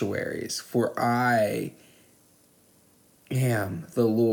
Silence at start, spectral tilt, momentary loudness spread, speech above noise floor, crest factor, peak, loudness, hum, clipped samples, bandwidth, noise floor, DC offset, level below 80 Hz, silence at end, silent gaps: 0 s; -6 dB/octave; 9 LU; 35 dB; 16 dB; -12 dBFS; -26 LUFS; none; under 0.1%; 19.5 kHz; -60 dBFS; under 0.1%; -68 dBFS; 0 s; none